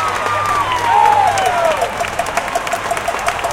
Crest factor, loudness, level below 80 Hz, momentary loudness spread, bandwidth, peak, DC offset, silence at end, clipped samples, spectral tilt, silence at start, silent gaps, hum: 16 dB; -15 LUFS; -42 dBFS; 7 LU; 17 kHz; 0 dBFS; under 0.1%; 0 s; under 0.1%; -2.5 dB/octave; 0 s; none; none